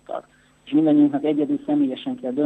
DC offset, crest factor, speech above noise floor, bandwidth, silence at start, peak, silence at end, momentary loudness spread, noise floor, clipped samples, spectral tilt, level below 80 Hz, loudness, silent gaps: under 0.1%; 14 dB; 31 dB; 3.9 kHz; 0.1 s; -8 dBFS; 0 s; 13 LU; -50 dBFS; under 0.1%; -8.5 dB/octave; -68 dBFS; -21 LUFS; none